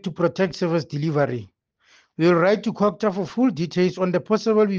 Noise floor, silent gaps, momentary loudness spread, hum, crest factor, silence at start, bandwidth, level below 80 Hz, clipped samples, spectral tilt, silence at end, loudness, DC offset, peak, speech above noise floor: -58 dBFS; none; 6 LU; none; 16 dB; 0.05 s; 7.4 kHz; -62 dBFS; under 0.1%; -7 dB/octave; 0 s; -22 LUFS; under 0.1%; -6 dBFS; 38 dB